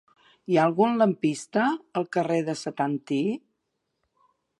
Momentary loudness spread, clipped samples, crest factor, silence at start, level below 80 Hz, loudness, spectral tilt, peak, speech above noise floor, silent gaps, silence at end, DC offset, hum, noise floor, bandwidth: 9 LU; under 0.1%; 18 dB; 0.5 s; -76 dBFS; -25 LUFS; -6 dB/octave; -8 dBFS; 54 dB; none; 1.2 s; under 0.1%; none; -79 dBFS; 11.5 kHz